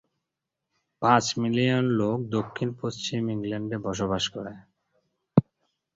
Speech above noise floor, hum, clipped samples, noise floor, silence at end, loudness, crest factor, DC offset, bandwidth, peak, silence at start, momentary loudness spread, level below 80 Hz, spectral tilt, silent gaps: 59 dB; none; under 0.1%; -85 dBFS; 0.55 s; -26 LUFS; 22 dB; under 0.1%; 7.8 kHz; -4 dBFS; 1 s; 9 LU; -58 dBFS; -5.5 dB/octave; none